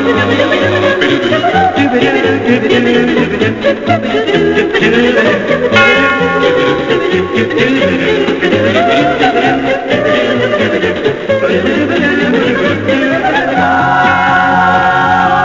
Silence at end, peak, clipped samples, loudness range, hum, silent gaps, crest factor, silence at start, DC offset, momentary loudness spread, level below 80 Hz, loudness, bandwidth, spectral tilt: 0 s; 0 dBFS; 0.1%; 2 LU; none; none; 10 dB; 0 s; under 0.1%; 3 LU; -38 dBFS; -10 LUFS; 7.6 kHz; -5.5 dB/octave